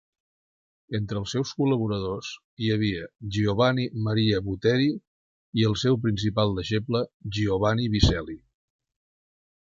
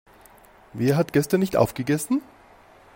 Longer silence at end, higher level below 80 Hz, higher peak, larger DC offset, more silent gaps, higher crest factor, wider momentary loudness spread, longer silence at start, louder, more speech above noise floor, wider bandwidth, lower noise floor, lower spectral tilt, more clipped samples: first, 1.35 s vs 0.7 s; first, -42 dBFS vs -56 dBFS; about the same, -4 dBFS vs -4 dBFS; neither; first, 2.44-2.57 s, 5.07-5.53 s, 7.14-7.20 s vs none; about the same, 22 dB vs 20 dB; first, 9 LU vs 6 LU; first, 0.9 s vs 0.75 s; second, -26 LUFS vs -23 LUFS; first, over 65 dB vs 30 dB; second, 7.6 kHz vs 16.5 kHz; first, under -90 dBFS vs -52 dBFS; about the same, -6.5 dB/octave vs -6.5 dB/octave; neither